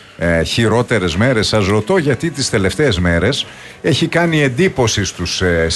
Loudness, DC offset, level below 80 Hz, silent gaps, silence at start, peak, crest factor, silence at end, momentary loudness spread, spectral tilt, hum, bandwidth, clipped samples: -15 LUFS; under 0.1%; -34 dBFS; none; 0.2 s; -2 dBFS; 14 dB; 0 s; 4 LU; -5 dB/octave; none; 12 kHz; under 0.1%